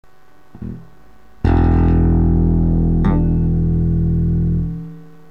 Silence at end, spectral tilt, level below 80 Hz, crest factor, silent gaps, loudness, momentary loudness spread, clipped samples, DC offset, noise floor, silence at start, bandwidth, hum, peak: 0.25 s; -11.5 dB/octave; -20 dBFS; 12 dB; none; -16 LUFS; 18 LU; under 0.1%; 1%; -52 dBFS; 0.55 s; 4.1 kHz; none; -4 dBFS